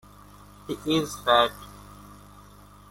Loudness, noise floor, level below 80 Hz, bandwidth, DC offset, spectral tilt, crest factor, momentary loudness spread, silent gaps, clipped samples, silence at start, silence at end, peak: -24 LUFS; -50 dBFS; -54 dBFS; 16.5 kHz; under 0.1%; -4 dB/octave; 22 dB; 26 LU; none; under 0.1%; 0.7 s; 0.75 s; -6 dBFS